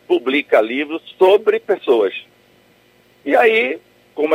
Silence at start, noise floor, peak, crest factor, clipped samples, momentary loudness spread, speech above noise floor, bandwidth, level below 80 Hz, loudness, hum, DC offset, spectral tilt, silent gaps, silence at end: 0.1 s; -53 dBFS; 0 dBFS; 16 dB; under 0.1%; 16 LU; 38 dB; 15 kHz; -70 dBFS; -16 LUFS; 60 Hz at -60 dBFS; under 0.1%; -4.5 dB/octave; none; 0 s